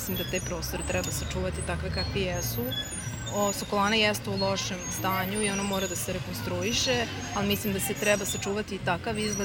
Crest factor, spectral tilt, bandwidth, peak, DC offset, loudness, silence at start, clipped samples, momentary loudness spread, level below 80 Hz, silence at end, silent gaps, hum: 20 dB; -3.5 dB/octave; 17 kHz; -10 dBFS; under 0.1%; -28 LUFS; 0 s; under 0.1%; 7 LU; -44 dBFS; 0 s; none; none